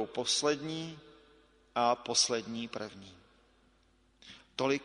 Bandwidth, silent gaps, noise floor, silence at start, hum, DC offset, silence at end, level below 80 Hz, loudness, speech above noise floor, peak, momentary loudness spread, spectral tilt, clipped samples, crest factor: 10.5 kHz; none; -68 dBFS; 0 s; none; under 0.1%; 0 s; -70 dBFS; -32 LUFS; 35 dB; -14 dBFS; 25 LU; -2.5 dB/octave; under 0.1%; 20 dB